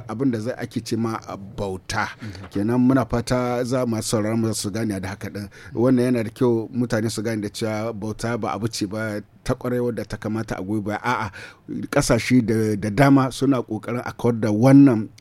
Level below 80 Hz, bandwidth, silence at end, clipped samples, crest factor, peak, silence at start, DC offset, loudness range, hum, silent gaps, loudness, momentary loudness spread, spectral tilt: -46 dBFS; 15 kHz; 0.1 s; under 0.1%; 18 dB; -2 dBFS; 0 s; under 0.1%; 6 LU; none; none; -22 LUFS; 13 LU; -6 dB/octave